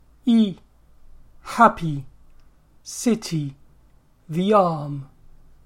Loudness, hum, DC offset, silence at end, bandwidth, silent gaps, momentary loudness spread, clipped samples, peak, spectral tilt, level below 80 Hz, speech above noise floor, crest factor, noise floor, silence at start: -21 LUFS; none; under 0.1%; 0.6 s; 14.5 kHz; none; 18 LU; under 0.1%; -2 dBFS; -6 dB/octave; -50 dBFS; 34 dB; 22 dB; -54 dBFS; 0.25 s